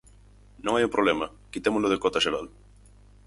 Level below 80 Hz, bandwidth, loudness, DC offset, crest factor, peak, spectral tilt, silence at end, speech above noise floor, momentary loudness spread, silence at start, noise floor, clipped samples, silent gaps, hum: -52 dBFS; 11.5 kHz; -26 LUFS; under 0.1%; 20 dB; -8 dBFS; -4 dB/octave; 0.8 s; 28 dB; 11 LU; 0.65 s; -53 dBFS; under 0.1%; none; 50 Hz at -50 dBFS